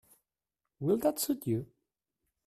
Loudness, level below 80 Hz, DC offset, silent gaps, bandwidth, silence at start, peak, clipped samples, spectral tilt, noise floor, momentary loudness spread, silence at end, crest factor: -32 LUFS; -70 dBFS; under 0.1%; none; 15.5 kHz; 0.8 s; -16 dBFS; under 0.1%; -5.5 dB/octave; -90 dBFS; 8 LU; 0.8 s; 20 dB